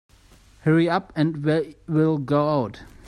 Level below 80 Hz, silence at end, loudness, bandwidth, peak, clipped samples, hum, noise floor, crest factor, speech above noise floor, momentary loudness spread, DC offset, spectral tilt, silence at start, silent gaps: -54 dBFS; 0 s; -23 LUFS; 10 kHz; -6 dBFS; under 0.1%; none; -52 dBFS; 16 dB; 31 dB; 6 LU; under 0.1%; -8.5 dB/octave; 0.65 s; none